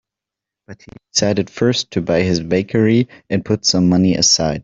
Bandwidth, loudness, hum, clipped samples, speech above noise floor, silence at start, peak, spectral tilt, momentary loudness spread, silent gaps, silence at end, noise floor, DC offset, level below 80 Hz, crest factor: 7.6 kHz; -16 LUFS; none; under 0.1%; 69 dB; 0.7 s; -2 dBFS; -4.5 dB/octave; 7 LU; none; 0 s; -85 dBFS; under 0.1%; -48 dBFS; 16 dB